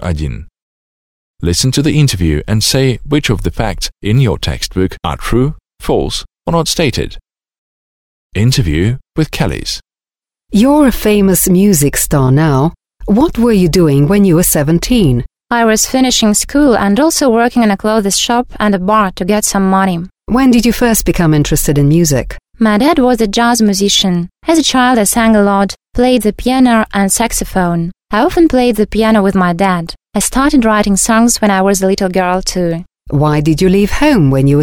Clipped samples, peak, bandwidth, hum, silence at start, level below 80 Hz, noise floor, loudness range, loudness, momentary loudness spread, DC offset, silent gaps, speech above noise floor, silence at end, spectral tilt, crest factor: under 0.1%; 0 dBFS; 18 kHz; none; 0 s; -28 dBFS; under -90 dBFS; 5 LU; -11 LUFS; 8 LU; under 0.1%; 0.62-1.34 s, 7.58-8.30 s; over 79 dB; 0 s; -5 dB/octave; 10 dB